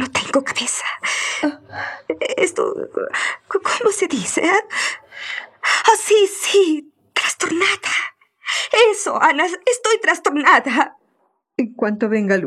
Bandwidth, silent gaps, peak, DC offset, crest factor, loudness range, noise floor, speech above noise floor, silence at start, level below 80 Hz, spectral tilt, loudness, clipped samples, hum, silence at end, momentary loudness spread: 14 kHz; none; 0 dBFS; under 0.1%; 18 dB; 5 LU; -65 dBFS; 48 dB; 0 s; -68 dBFS; -2 dB/octave; -18 LUFS; under 0.1%; none; 0 s; 11 LU